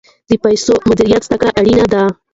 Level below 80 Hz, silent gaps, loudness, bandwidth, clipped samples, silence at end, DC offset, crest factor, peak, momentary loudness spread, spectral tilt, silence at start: -36 dBFS; none; -12 LUFS; 8 kHz; under 0.1%; 0.2 s; under 0.1%; 12 dB; 0 dBFS; 4 LU; -5.5 dB/octave; 0.3 s